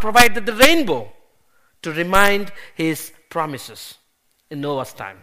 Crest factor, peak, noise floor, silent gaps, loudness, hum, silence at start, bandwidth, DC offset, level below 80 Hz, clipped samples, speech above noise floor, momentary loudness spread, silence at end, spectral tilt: 20 dB; 0 dBFS; -64 dBFS; none; -18 LUFS; none; 0 s; 15.5 kHz; under 0.1%; -44 dBFS; under 0.1%; 46 dB; 20 LU; 0 s; -3 dB/octave